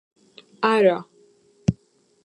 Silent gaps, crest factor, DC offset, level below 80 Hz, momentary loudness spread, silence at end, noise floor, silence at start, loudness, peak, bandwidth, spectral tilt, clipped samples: none; 20 dB; under 0.1%; -52 dBFS; 12 LU; 0.5 s; -60 dBFS; 0.6 s; -22 LUFS; -4 dBFS; 11.5 kHz; -7 dB/octave; under 0.1%